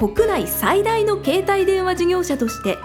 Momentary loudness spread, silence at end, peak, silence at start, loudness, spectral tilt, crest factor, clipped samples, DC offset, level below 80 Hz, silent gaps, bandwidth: 4 LU; 0 s; -4 dBFS; 0 s; -19 LUFS; -4.5 dB/octave; 14 dB; under 0.1%; under 0.1%; -40 dBFS; none; 19.5 kHz